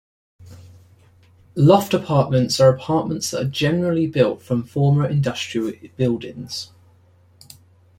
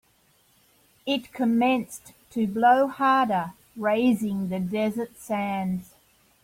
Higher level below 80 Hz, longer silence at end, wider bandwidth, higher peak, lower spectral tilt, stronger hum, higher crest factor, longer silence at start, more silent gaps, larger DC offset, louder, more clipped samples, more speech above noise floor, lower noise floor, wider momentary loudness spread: first, -54 dBFS vs -64 dBFS; first, 1.35 s vs 0.6 s; about the same, 16.5 kHz vs 16.5 kHz; first, -2 dBFS vs -8 dBFS; about the same, -6 dB/octave vs -6 dB/octave; neither; about the same, 18 dB vs 18 dB; second, 0.4 s vs 1.05 s; neither; neither; first, -20 LUFS vs -25 LUFS; neither; second, 35 dB vs 39 dB; second, -54 dBFS vs -63 dBFS; about the same, 14 LU vs 14 LU